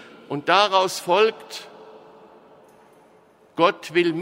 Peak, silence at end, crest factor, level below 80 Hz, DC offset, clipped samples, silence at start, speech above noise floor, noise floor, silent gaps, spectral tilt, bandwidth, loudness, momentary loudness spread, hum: -2 dBFS; 0 s; 20 dB; -76 dBFS; under 0.1%; under 0.1%; 0.3 s; 34 dB; -55 dBFS; none; -3.5 dB/octave; 16 kHz; -20 LUFS; 19 LU; none